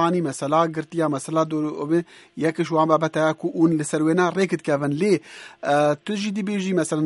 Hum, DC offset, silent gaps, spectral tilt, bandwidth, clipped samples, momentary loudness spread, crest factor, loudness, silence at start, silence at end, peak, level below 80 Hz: none; under 0.1%; none; -6 dB/octave; 11.5 kHz; under 0.1%; 6 LU; 18 dB; -22 LUFS; 0 s; 0 s; -4 dBFS; -68 dBFS